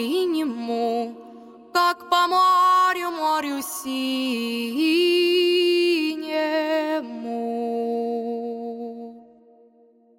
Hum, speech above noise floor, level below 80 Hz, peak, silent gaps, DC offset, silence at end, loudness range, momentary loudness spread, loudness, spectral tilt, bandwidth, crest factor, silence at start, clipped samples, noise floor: none; 35 dB; -74 dBFS; -6 dBFS; none; under 0.1%; 0.95 s; 6 LU; 13 LU; -22 LUFS; -2.5 dB/octave; 17 kHz; 16 dB; 0 s; under 0.1%; -56 dBFS